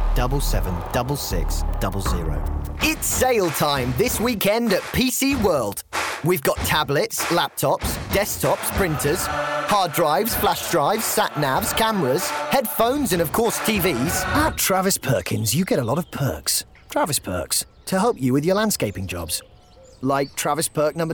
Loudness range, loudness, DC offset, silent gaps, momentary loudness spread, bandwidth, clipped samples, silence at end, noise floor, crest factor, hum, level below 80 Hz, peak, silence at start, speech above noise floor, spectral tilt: 3 LU; -21 LUFS; under 0.1%; none; 6 LU; over 20 kHz; under 0.1%; 0 s; -48 dBFS; 14 dB; none; -32 dBFS; -6 dBFS; 0 s; 27 dB; -4 dB/octave